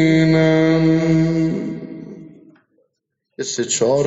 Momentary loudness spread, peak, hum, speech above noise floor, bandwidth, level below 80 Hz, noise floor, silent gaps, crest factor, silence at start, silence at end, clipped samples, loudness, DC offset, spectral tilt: 18 LU; -4 dBFS; none; 59 dB; 8 kHz; -46 dBFS; -74 dBFS; none; 14 dB; 0 s; 0 s; under 0.1%; -17 LUFS; under 0.1%; -6.5 dB/octave